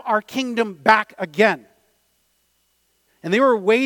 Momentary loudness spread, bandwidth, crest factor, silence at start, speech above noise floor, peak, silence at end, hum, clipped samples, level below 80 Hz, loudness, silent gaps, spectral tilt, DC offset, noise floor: 11 LU; 19 kHz; 20 dB; 0.05 s; 47 dB; 0 dBFS; 0 s; none; under 0.1%; -66 dBFS; -19 LUFS; none; -5 dB/octave; under 0.1%; -66 dBFS